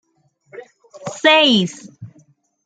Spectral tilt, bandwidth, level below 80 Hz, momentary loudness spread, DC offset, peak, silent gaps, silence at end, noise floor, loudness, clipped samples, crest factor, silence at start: -4 dB/octave; 9.2 kHz; -64 dBFS; 22 LU; under 0.1%; -2 dBFS; none; 0.6 s; -60 dBFS; -14 LUFS; under 0.1%; 18 dB; 0.55 s